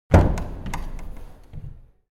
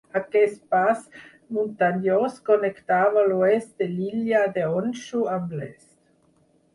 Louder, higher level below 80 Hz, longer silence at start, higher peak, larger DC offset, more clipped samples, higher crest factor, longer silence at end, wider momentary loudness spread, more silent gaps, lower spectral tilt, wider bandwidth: about the same, -24 LUFS vs -23 LUFS; first, -28 dBFS vs -68 dBFS; about the same, 0.1 s vs 0.15 s; first, 0 dBFS vs -6 dBFS; neither; neither; about the same, 22 dB vs 18 dB; second, 0.3 s vs 1 s; first, 25 LU vs 9 LU; neither; about the same, -7.5 dB/octave vs -7 dB/octave; first, 13 kHz vs 11.5 kHz